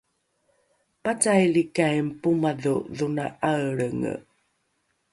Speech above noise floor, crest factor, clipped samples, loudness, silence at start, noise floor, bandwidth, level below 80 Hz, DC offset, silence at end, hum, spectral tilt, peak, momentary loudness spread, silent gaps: 49 dB; 20 dB; under 0.1%; -25 LUFS; 1.05 s; -73 dBFS; 11.5 kHz; -62 dBFS; under 0.1%; 0.9 s; none; -5.5 dB/octave; -6 dBFS; 10 LU; none